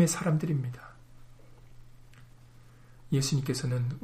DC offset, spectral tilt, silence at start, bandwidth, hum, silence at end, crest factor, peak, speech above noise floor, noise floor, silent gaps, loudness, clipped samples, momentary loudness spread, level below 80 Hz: under 0.1%; -5.5 dB/octave; 0 s; 15.5 kHz; none; 0 s; 20 dB; -12 dBFS; 24 dB; -53 dBFS; none; -30 LUFS; under 0.1%; 14 LU; -56 dBFS